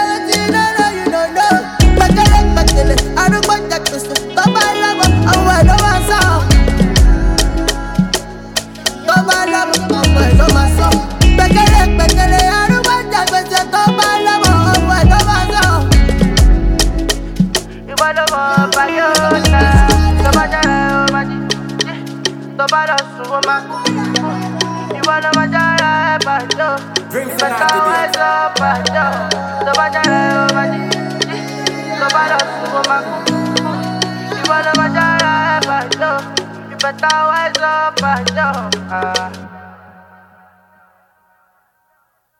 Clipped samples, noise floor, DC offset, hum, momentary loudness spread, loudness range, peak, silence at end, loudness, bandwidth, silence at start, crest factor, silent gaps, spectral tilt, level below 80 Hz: under 0.1%; -61 dBFS; under 0.1%; none; 9 LU; 5 LU; 0 dBFS; 2.65 s; -13 LUFS; 17.5 kHz; 0 s; 12 dB; none; -4 dB/octave; -18 dBFS